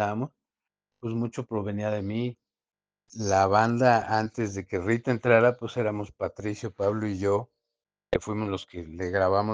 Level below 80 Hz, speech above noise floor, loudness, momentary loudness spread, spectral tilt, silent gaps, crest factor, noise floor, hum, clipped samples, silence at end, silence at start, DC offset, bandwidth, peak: -58 dBFS; over 64 dB; -27 LUFS; 13 LU; -6.5 dB/octave; none; 22 dB; under -90 dBFS; none; under 0.1%; 0 s; 0 s; under 0.1%; 9.6 kHz; -6 dBFS